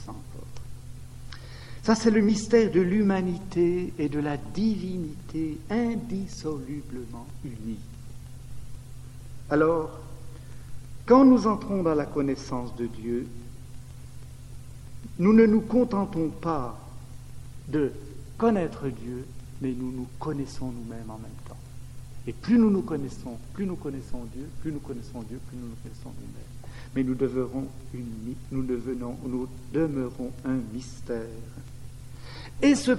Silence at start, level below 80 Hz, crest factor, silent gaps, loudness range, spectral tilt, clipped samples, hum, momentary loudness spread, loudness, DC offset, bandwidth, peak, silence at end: 0 s; -46 dBFS; 22 dB; none; 11 LU; -7 dB/octave; under 0.1%; none; 23 LU; -27 LUFS; 0.2%; 13 kHz; -6 dBFS; 0 s